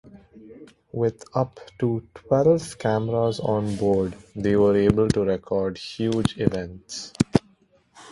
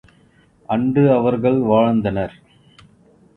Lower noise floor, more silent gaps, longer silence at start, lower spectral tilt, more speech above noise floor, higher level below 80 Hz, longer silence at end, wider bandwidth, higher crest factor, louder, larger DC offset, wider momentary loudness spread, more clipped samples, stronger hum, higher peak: first, -60 dBFS vs -54 dBFS; neither; second, 0.05 s vs 0.7 s; second, -7 dB/octave vs -10 dB/octave; about the same, 37 dB vs 38 dB; about the same, -48 dBFS vs -48 dBFS; second, 0 s vs 1.1 s; first, 11.5 kHz vs 4.2 kHz; first, 24 dB vs 16 dB; second, -24 LUFS vs -17 LUFS; neither; about the same, 11 LU vs 9 LU; neither; neither; about the same, 0 dBFS vs -2 dBFS